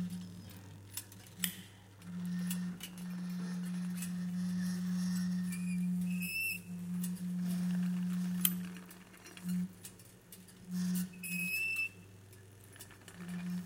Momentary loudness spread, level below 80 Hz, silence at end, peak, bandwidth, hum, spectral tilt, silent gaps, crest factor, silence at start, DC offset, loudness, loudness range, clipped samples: 19 LU; -72 dBFS; 0 s; -8 dBFS; 17 kHz; none; -4.5 dB/octave; none; 32 dB; 0 s; under 0.1%; -38 LUFS; 4 LU; under 0.1%